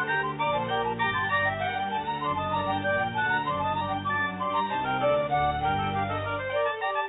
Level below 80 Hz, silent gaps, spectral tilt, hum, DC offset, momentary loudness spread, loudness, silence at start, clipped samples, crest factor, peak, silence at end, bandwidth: -52 dBFS; none; -8.5 dB/octave; none; under 0.1%; 4 LU; -27 LUFS; 0 s; under 0.1%; 14 dB; -14 dBFS; 0 s; 4.1 kHz